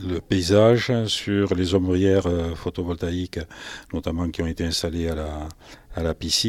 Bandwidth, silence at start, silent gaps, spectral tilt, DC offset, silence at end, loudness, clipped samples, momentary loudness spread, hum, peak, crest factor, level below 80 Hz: 15.5 kHz; 0 s; none; -5.5 dB/octave; under 0.1%; 0 s; -23 LUFS; under 0.1%; 15 LU; none; -4 dBFS; 20 dB; -42 dBFS